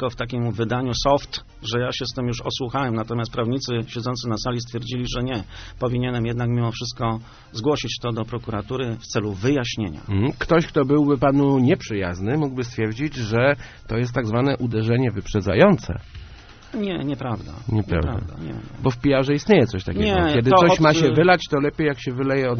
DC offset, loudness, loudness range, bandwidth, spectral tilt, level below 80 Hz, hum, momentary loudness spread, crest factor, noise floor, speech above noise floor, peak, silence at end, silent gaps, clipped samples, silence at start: under 0.1%; -22 LUFS; 8 LU; 6.6 kHz; -5.5 dB/octave; -40 dBFS; none; 12 LU; 22 dB; -43 dBFS; 21 dB; 0 dBFS; 0 s; none; under 0.1%; 0 s